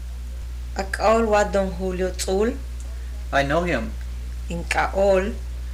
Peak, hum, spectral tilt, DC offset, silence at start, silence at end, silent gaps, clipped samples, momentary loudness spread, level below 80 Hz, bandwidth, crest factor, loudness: -6 dBFS; 60 Hz at -30 dBFS; -5 dB/octave; under 0.1%; 0 s; 0 s; none; under 0.1%; 15 LU; -30 dBFS; 16 kHz; 16 dB; -23 LUFS